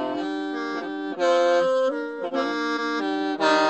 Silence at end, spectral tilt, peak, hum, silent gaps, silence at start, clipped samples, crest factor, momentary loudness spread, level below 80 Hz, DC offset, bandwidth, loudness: 0 s; -3.5 dB/octave; -6 dBFS; none; none; 0 s; under 0.1%; 18 dB; 9 LU; -80 dBFS; under 0.1%; 8.6 kHz; -24 LUFS